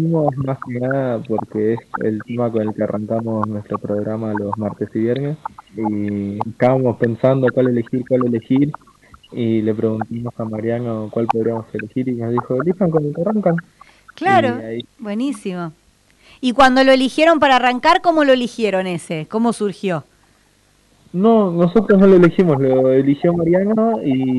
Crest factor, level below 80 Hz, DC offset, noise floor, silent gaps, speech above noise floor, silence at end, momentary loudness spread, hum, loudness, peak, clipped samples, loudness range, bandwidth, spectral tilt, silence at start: 14 dB; -52 dBFS; under 0.1%; -56 dBFS; none; 39 dB; 0 s; 12 LU; none; -17 LUFS; -2 dBFS; under 0.1%; 7 LU; 12 kHz; -7 dB/octave; 0 s